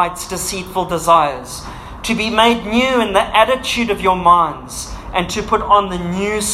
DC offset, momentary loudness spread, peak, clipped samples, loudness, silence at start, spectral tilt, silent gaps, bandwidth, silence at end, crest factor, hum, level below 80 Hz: under 0.1%; 14 LU; 0 dBFS; under 0.1%; -15 LUFS; 0 s; -3.5 dB/octave; none; 16 kHz; 0 s; 16 dB; none; -36 dBFS